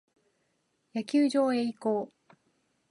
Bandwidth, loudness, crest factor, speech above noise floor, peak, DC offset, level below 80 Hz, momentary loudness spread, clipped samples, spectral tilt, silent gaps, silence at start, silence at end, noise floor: 11.5 kHz; -29 LUFS; 16 dB; 48 dB; -16 dBFS; under 0.1%; -86 dBFS; 13 LU; under 0.1%; -5.5 dB/octave; none; 0.95 s; 0.85 s; -75 dBFS